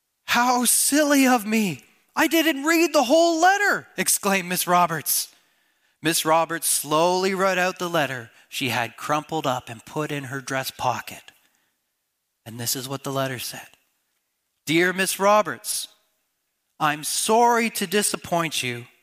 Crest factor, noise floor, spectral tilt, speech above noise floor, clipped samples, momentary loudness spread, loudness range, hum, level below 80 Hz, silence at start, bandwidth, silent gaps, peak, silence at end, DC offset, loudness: 18 dB; -76 dBFS; -3 dB/octave; 54 dB; under 0.1%; 12 LU; 10 LU; none; -68 dBFS; 0.25 s; 15.5 kHz; none; -6 dBFS; 0.15 s; under 0.1%; -22 LUFS